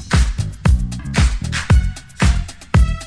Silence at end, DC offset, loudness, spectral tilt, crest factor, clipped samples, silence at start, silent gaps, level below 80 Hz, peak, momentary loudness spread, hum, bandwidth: 0 s; under 0.1%; -18 LUFS; -5.5 dB/octave; 14 dB; under 0.1%; 0 s; none; -18 dBFS; -2 dBFS; 6 LU; none; 11 kHz